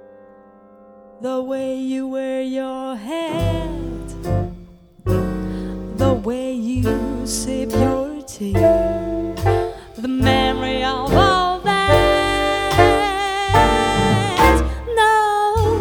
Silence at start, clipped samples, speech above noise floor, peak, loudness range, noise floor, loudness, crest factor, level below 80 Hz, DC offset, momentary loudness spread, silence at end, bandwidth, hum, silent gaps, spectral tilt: 1.2 s; under 0.1%; 26 dB; 0 dBFS; 9 LU; -46 dBFS; -19 LUFS; 18 dB; -30 dBFS; under 0.1%; 12 LU; 0 s; over 20 kHz; none; none; -5.5 dB/octave